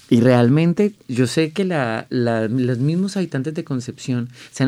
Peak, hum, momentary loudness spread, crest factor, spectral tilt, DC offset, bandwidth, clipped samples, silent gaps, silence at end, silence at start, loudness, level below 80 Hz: -2 dBFS; none; 11 LU; 16 dB; -7 dB/octave; under 0.1%; 13 kHz; under 0.1%; none; 0 s; 0.1 s; -19 LUFS; -62 dBFS